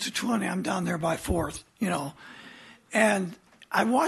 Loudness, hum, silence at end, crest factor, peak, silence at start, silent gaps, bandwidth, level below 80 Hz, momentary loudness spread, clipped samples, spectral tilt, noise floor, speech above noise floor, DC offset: -28 LUFS; none; 0 s; 20 dB; -8 dBFS; 0 s; none; 12.5 kHz; -48 dBFS; 19 LU; under 0.1%; -4.5 dB/octave; -50 dBFS; 23 dB; under 0.1%